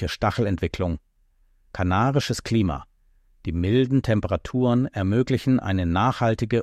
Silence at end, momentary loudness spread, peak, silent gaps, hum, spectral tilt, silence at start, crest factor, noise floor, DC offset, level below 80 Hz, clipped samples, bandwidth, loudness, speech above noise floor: 0 s; 8 LU; -8 dBFS; none; none; -7 dB/octave; 0 s; 16 dB; -61 dBFS; under 0.1%; -42 dBFS; under 0.1%; 13.5 kHz; -23 LUFS; 39 dB